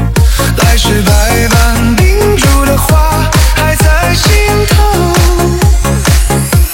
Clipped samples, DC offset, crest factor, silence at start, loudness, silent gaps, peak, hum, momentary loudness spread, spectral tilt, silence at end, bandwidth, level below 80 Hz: 0.5%; under 0.1%; 8 dB; 0 s; -9 LUFS; none; 0 dBFS; none; 2 LU; -4.5 dB/octave; 0 s; 17 kHz; -10 dBFS